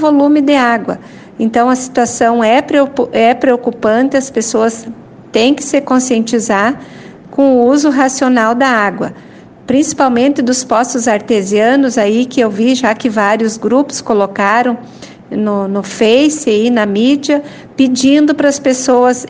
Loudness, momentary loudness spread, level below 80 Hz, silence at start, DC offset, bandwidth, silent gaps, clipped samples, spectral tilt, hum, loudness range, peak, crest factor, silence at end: -11 LUFS; 7 LU; -52 dBFS; 0 s; under 0.1%; 10 kHz; none; under 0.1%; -4 dB/octave; none; 2 LU; 0 dBFS; 12 dB; 0 s